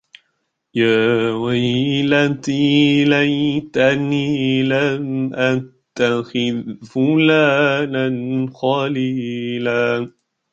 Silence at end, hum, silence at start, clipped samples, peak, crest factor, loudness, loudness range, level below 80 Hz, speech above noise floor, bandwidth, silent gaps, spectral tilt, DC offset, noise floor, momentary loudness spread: 0.45 s; none; 0.75 s; under 0.1%; -2 dBFS; 16 dB; -17 LUFS; 2 LU; -58 dBFS; 54 dB; 7.8 kHz; none; -6.5 dB/octave; under 0.1%; -71 dBFS; 9 LU